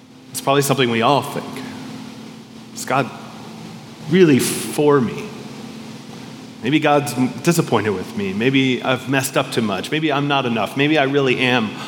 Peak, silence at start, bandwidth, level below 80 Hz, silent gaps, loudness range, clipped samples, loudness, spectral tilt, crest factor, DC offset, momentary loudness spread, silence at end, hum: 0 dBFS; 0.1 s; 18 kHz; -68 dBFS; none; 3 LU; under 0.1%; -18 LUFS; -5 dB/octave; 18 dB; under 0.1%; 19 LU; 0 s; none